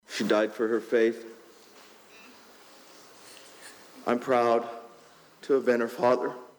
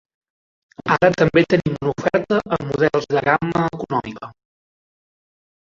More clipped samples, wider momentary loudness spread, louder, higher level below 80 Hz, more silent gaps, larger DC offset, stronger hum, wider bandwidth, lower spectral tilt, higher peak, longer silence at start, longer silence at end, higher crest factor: neither; first, 22 LU vs 11 LU; second, -26 LUFS vs -19 LUFS; second, -80 dBFS vs -50 dBFS; neither; neither; neither; first, over 20 kHz vs 7.6 kHz; second, -5 dB/octave vs -7 dB/octave; second, -12 dBFS vs -2 dBFS; second, 0.1 s vs 0.85 s; second, 0.1 s vs 1.3 s; about the same, 16 dB vs 18 dB